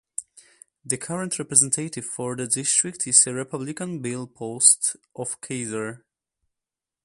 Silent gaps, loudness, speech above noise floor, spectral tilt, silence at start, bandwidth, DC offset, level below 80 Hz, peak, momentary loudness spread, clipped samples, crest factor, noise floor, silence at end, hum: none; -22 LUFS; 64 dB; -2.5 dB/octave; 0.2 s; 12 kHz; under 0.1%; -68 dBFS; 0 dBFS; 16 LU; under 0.1%; 26 dB; -88 dBFS; 1.05 s; none